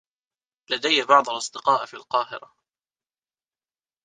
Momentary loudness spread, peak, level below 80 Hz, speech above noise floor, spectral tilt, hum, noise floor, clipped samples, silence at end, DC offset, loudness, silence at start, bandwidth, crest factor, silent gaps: 12 LU; -2 dBFS; -76 dBFS; over 67 dB; -1.5 dB/octave; none; under -90 dBFS; under 0.1%; 1.65 s; under 0.1%; -22 LUFS; 0.7 s; 9.8 kHz; 24 dB; none